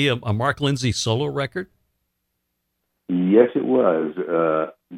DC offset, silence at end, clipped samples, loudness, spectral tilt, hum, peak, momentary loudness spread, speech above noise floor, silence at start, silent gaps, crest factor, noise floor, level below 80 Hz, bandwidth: under 0.1%; 0 s; under 0.1%; -21 LUFS; -5.5 dB/octave; none; -2 dBFS; 10 LU; 55 dB; 0 s; none; 20 dB; -75 dBFS; -54 dBFS; 13 kHz